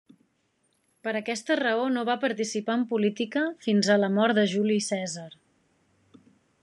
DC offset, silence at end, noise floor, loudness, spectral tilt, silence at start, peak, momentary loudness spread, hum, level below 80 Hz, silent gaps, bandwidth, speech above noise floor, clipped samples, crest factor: under 0.1%; 1.3 s; -71 dBFS; -26 LUFS; -4.5 dB/octave; 1.05 s; -10 dBFS; 9 LU; none; -84 dBFS; none; 11 kHz; 46 dB; under 0.1%; 18 dB